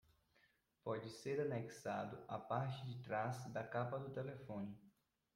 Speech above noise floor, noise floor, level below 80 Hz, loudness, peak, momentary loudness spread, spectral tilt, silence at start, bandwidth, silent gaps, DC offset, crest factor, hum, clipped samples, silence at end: 33 dB; -78 dBFS; -80 dBFS; -46 LUFS; -28 dBFS; 7 LU; -6.5 dB/octave; 0.85 s; 16 kHz; none; under 0.1%; 20 dB; none; under 0.1%; 0.45 s